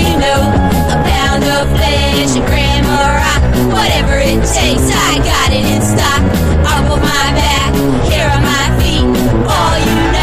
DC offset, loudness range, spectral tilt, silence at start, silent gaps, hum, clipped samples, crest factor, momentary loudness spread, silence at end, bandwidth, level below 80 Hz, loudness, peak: under 0.1%; 0 LU; -4.5 dB/octave; 0 s; none; none; under 0.1%; 10 dB; 1 LU; 0 s; 15.5 kHz; -16 dBFS; -11 LUFS; 0 dBFS